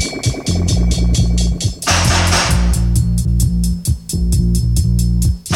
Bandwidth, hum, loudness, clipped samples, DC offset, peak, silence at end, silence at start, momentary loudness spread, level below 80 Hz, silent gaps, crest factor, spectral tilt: 16 kHz; none; -15 LUFS; under 0.1%; under 0.1%; -2 dBFS; 0 s; 0 s; 5 LU; -18 dBFS; none; 12 dB; -4.5 dB/octave